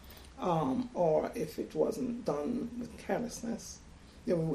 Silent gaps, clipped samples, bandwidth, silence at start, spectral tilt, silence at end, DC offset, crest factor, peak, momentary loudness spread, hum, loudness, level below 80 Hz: none; under 0.1%; 15 kHz; 0 s; -6.5 dB/octave; 0 s; under 0.1%; 18 dB; -16 dBFS; 12 LU; none; -35 LUFS; -58 dBFS